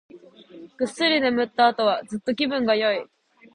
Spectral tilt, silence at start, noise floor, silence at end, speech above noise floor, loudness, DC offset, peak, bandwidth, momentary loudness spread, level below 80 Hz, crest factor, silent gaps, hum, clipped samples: -4 dB/octave; 0.15 s; -46 dBFS; 0.5 s; 24 dB; -22 LUFS; under 0.1%; -4 dBFS; 11 kHz; 10 LU; -66 dBFS; 20 dB; none; none; under 0.1%